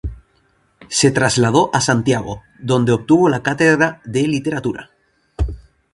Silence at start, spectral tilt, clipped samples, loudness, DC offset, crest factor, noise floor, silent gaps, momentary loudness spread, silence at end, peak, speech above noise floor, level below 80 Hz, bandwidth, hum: 0.05 s; -5 dB/octave; under 0.1%; -16 LUFS; under 0.1%; 18 dB; -59 dBFS; none; 12 LU; 0.35 s; 0 dBFS; 44 dB; -34 dBFS; 11.5 kHz; none